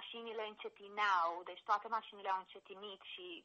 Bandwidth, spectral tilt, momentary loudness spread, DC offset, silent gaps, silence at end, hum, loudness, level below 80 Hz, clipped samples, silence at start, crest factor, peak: 8 kHz; -2.5 dB/octave; 16 LU; under 0.1%; none; 0.05 s; none; -40 LUFS; under -90 dBFS; under 0.1%; 0 s; 20 dB; -22 dBFS